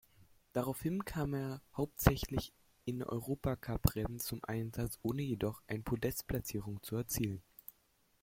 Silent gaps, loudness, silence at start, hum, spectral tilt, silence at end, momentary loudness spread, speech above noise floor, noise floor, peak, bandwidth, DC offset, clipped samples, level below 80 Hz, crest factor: none; -38 LUFS; 0.2 s; none; -6 dB/octave; 0.85 s; 9 LU; 36 dB; -74 dBFS; -10 dBFS; 16.5 kHz; under 0.1%; under 0.1%; -50 dBFS; 28 dB